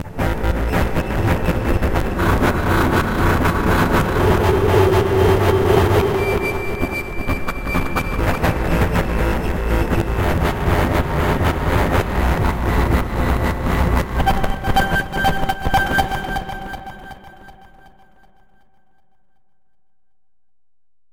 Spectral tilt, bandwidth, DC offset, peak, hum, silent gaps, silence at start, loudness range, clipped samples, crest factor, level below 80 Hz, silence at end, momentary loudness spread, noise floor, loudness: -6.5 dB/octave; 17 kHz; under 0.1%; -2 dBFS; none; none; 0 s; 6 LU; under 0.1%; 16 dB; -24 dBFS; 3.6 s; 8 LU; -84 dBFS; -18 LUFS